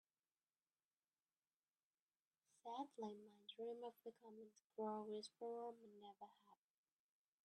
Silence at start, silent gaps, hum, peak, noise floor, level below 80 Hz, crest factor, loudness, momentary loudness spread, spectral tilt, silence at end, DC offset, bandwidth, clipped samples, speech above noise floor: 2.65 s; 4.64-4.70 s; none; -38 dBFS; under -90 dBFS; under -90 dBFS; 20 dB; -55 LUFS; 13 LU; -5 dB/octave; 0.9 s; under 0.1%; 10 kHz; under 0.1%; over 36 dB